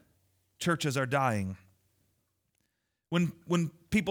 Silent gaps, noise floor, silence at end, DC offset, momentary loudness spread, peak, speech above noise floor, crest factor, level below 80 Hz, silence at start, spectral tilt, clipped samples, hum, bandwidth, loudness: none; -81 dBFS; 0 s; under 0.1%; 6 LU; -14 dBFS; 51 dB; 18 dB; -60 dBFS; 0.6 s; -5.5 dB/octave; under 0.1%; none; 18 kHz; -31 LUFS